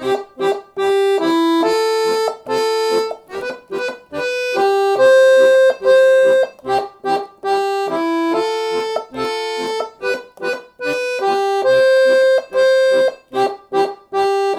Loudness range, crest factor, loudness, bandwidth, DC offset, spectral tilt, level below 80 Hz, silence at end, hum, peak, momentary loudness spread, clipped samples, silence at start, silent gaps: 7 LU; 12 dB; -16 LUFS; 13.5 kHz; under 0.1%; -3.5 dB/octave; -60 dBFS; 0 s; none; -4 dBFS; 12 LU; under 0.1%; 0 s; none